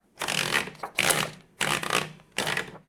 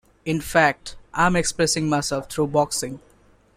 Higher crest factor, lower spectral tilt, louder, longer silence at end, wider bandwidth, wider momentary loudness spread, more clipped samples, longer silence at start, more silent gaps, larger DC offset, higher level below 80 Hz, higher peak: about the same, 24 dB vs 20 dB; second, -1.5 dB/octave vs -4 dB/octave; second, -27 LUFS vs -22 LUFS; second, 0.1 s vs 0.6 s; first, over 20 kHz vs 16 kHz; second, 8 LU vs 13 LU; neither; about the same, 0.2 s vs 0.25 s; neither; neither; second, -60 dBFS vs -46 dBFS; about the same, -6 dBFS vs -4 dBFS